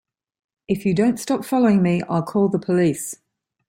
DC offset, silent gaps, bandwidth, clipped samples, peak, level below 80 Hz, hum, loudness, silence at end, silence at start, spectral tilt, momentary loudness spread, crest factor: under 0.1%; none; 16.5 kHz; under 0.1%; -6 dBFS; -58 dBFS; none; -20 LUFS; 0.55 s; 0.7 s; -6.5 dB/octave; 10 LU; 14 dB